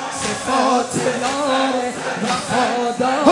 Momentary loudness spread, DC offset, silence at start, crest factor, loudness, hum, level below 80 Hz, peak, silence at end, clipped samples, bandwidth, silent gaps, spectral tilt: 6 LU; under 0.1%; 0 s; 18 dB; -19 LUFS; none; -56 dBFS; 0 dBFS; 0 s; under 0.1%; 11.5 kHz; none; -3.5 dB/octave